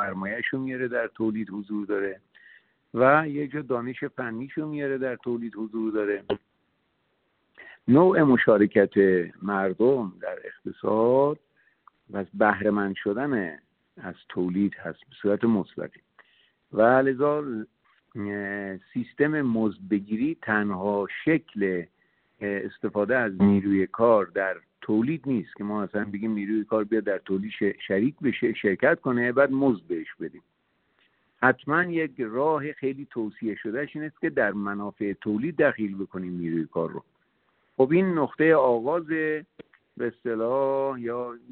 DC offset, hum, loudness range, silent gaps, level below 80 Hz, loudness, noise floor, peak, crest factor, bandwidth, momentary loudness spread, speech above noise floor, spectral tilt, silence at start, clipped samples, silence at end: under 0.1%; none; 6 LU; none; -66 dBFS; -26 LUFS; -72 dBFS; -4 dBFS; 22 dB; 4.3 kHz; 13 LU; 47 dB; -6 dB/octave; 0 s; under 0.1%; 0.15 s